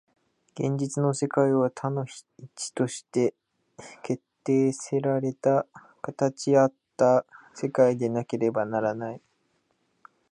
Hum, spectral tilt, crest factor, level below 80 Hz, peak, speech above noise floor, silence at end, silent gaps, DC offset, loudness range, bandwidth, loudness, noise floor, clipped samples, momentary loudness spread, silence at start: none; -6.5 dB/octave; 18 dB; -74 dBFS; -8 dBFS; 46 dB; 1.15 s; none; under 0.1%; 4 LU; 11.5 kHz; -26 LUFS; -72 dBFS; under 0.1%; 17 LU; 0.55 s